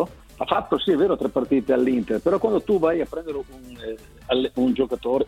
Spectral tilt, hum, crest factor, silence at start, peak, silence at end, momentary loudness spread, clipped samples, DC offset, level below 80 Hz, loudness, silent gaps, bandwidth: -6.5 dB/octave; none; 18 dB; 0 s; -4 dBFS; 0 s; 15 LU; under 0.1%; under 0.1%; -48 dBFS; -22 LUFS; none; 14.5 kHz